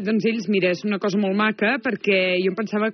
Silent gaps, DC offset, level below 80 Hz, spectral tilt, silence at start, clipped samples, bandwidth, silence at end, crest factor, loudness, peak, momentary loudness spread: none; under 0.1%; -78 dBFS; -4 dB/octave; 0 s; under 0.1%; 6.4 kHz; 0 s; 14 dB; -21 LUFS; -8 dBFS; 4 LU